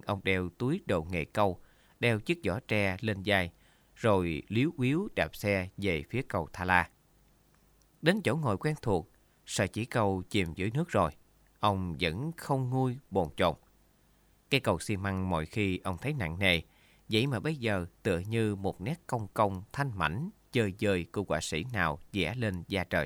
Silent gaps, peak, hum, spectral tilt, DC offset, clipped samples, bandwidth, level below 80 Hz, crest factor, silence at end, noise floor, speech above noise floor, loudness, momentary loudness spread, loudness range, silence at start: none; -8 dBFS; none; -5.5 dB/octave; under 0.1%; under 0.1%; 18 kHz; -54 dBFS; 24 dB; 0 s; -65 dBFS; 35 dB; -31 LUFS; 6 LU; 2 LU; 0.05 s